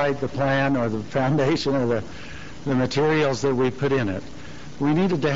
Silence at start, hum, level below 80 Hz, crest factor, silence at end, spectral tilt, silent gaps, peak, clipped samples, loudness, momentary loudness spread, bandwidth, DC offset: 0 s; none; -50 dBFS; 12 dB; 0 s; -5.5 dB/octave; none; -10 dBFS; under 0.1%; -23 LUFS; 16 LU; 7.8 kHz; 1%